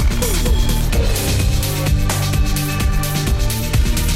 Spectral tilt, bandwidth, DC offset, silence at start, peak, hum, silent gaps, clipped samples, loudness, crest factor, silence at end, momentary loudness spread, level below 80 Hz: -4.5 dB/octave; 16.5 kHz; under 0.1%; 0 s; -4 dBFS; none; none; under 0.1%; -18 LUFS; 12 dB; 0 s; 1 LU; -18 dBFS